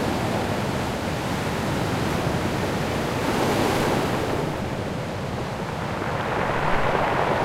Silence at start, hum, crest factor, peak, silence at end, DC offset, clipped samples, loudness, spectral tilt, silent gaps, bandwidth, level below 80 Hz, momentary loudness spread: 0 s; none; 18 dB; -6 dBFS; 0 s; under 0.1%; under 0.1%; -25 LUFS; -5.5 dB/octave; none; 16 kHz; -40 dBFS; 7 LU